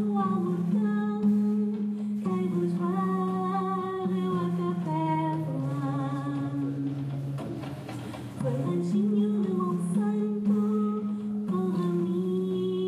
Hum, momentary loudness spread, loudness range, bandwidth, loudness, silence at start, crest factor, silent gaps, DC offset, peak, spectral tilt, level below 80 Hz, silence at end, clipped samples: none; 7 LU; 4 LU; 11.5 kHz; -29 LUFS; 0 s; 12 dB; none; under 0.1%; -16 dBFS; -9 dB/octave; -68 dBFS; 0 s; under 0.1%